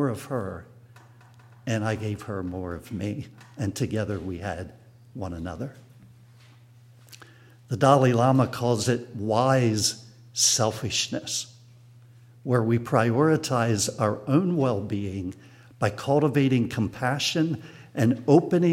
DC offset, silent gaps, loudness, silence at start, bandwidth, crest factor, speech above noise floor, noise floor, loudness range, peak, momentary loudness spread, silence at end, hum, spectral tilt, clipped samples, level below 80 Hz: under 0.1%; none; -25 LUFS; 0 s; 16 kHz; 22 dB; 28 dB; -52 dBFS; 10 LU; -4 dBFS; 17 LU; 0 s; none; -5 dB/octave; under 0.1%; -58 dBFS